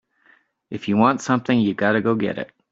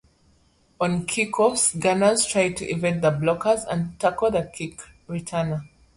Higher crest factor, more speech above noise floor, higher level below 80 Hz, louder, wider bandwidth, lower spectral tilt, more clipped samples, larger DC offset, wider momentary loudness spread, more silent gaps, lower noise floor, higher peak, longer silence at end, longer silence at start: about the same, 18 dB vs 18 dB; about the same, 39 dB vs 38 dB; second, -62 dBFS vs -54 dBFS; first, -20 LUFS vs -23 LUFS; second, 7.8 kHz vs 11.5 kHz; first, -6 dB/octave vs -4 dB/octave; neither; neither; about the same, 13 LU vs 14 LU; neither; about the same, -58 dBFS vs -61 dBFS; first, -2 dBFS vs -6 dBFS; about the same, 0.25 s vs 0.3 s; about the same, 0.7 s vs 0.8 s